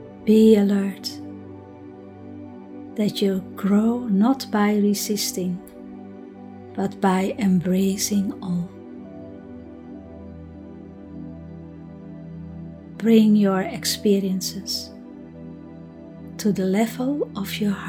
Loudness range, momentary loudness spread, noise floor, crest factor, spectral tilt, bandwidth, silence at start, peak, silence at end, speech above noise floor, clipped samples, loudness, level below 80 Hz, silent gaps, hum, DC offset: 14 LU; 22 LU; -41 dBFS; 20 dB; -5.5 dB/octave; 17 kHz; 0 s; -4 dBFS; 0 s; 21 dB; under 0.1%; -21 LUFS; -56 dBFS; none; none; under 0.1%